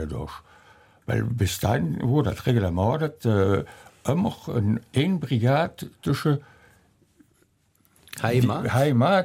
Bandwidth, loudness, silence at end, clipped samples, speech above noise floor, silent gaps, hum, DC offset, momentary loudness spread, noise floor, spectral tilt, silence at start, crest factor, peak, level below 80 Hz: 16.5 kHz; -24 LUFS; 0 s; under 0.1%; 41 dB; none; none; under 0.1%; 11 LU; -64 dBFS; -7 dB/octave; 0 s; 18 dB; -8 dBFS; -48 dBFS